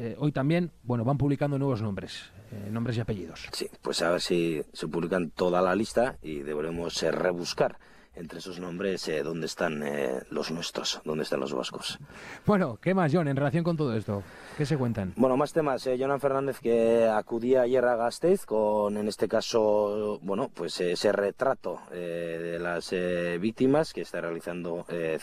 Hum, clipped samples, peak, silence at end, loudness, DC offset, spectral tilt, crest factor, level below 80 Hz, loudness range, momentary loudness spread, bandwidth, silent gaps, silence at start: none; under 0.1%; -12 dBFS; 0 s; -28 LUFS; under 0.1%; -6 dB/octave; 16 dB; -58 dBFS; 6 LU; 11 LU; 14.5 kHz; none; 0 s